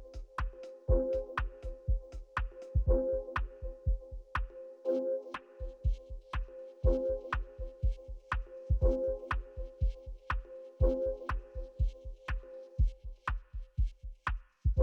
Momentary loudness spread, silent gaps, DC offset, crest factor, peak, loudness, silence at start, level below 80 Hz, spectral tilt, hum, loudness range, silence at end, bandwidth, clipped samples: 13 LU; none; under 0.1%; 18 dB; -18 dBFS; -37 LUFS; 0 s; -36 dBFS; -8.5 dB/octave; none; 3 LU; 0 s; 6 kHz; under 0.1%